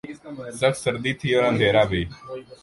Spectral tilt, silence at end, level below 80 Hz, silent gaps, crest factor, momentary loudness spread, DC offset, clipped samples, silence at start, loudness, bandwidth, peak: -5 dB/octave; 0.1 s; -46 dBFS; none; 16 dB; 18 LU; under 0.1%; under 0.1%; 0.05 s; -22 LUFS; 11.5 kHz; -6 dBFS